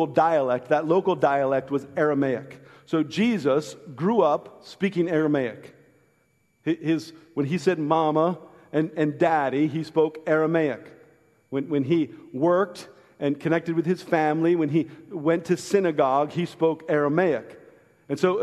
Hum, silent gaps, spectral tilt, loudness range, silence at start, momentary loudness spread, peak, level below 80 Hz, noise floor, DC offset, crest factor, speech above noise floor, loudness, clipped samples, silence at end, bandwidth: none; none; -7 dB/octave; 3 LU; 0 s; 9 LU; -6 dBFS; -70 dBFS; -66 dBFS; under 0.1%; 18 dB; 43 dB; -24 LUFS; under 0.1%; 0 s; 12.5 kHz